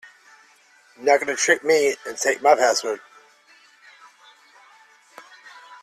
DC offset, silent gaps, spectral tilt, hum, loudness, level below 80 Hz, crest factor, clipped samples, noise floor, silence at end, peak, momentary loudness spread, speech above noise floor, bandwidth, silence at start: under 0.1%; none; -1 dB/octave; none; -20 LUFS; -74 dBFS; 20 dB; under 0.1%; -55 dBFS; 0.05 s; -4 dBFS; 12 LU; 36 dB; 14 kHz; 1 s